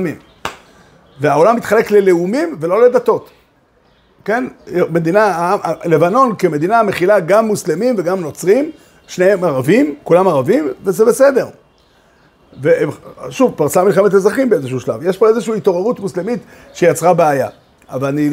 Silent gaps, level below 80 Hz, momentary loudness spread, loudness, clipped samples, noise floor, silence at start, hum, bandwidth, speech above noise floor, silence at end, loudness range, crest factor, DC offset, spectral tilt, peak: none; -56 dBFS; 11 LU; -14 LUFS; under 0.1%; -53 dBFS; 0 s; none; 16 kHz; 40 dB; 0 s; 2 LU; 14 dB; under 0.1%; -6 dB/octave; 0 dBFS